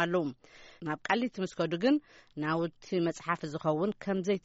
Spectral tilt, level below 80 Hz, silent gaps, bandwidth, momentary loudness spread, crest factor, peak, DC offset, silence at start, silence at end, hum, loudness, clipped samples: -5 dB/octave; -68 dBFS; none; 8 kHz; 9 LU; 18 dB; -14 dBFS; under 0.1%; 0 s; 0.05 s; none; -32 LUFS; under 0.1%